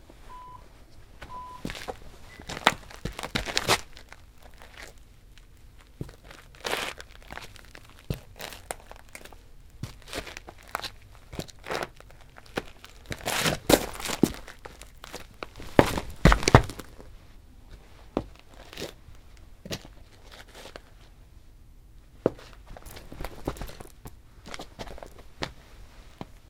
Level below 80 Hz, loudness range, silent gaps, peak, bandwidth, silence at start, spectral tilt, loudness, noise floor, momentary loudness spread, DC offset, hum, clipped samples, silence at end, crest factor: -42 dBFS; 15 LU; none; 0 dBFS; 18 kHz; 0.05 s; -4.5 dB/octave; -29 LUFS; -51 dBFS; 26 LU; under 0.1%; none; under 0.1%; 0.25 s; 32 dB